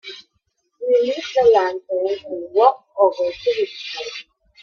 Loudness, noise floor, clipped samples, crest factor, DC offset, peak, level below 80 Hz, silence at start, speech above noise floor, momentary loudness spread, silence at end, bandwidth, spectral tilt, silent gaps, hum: -19 LUFS; -70 dBFS; under 0.1%; 18 dB; under 0.1%; -2 dBFS; -62 dBFS; 0.05 s; 51 dB; 15 LU; 0.4 s; 7 kHz; -3.5 dB/octave; none; none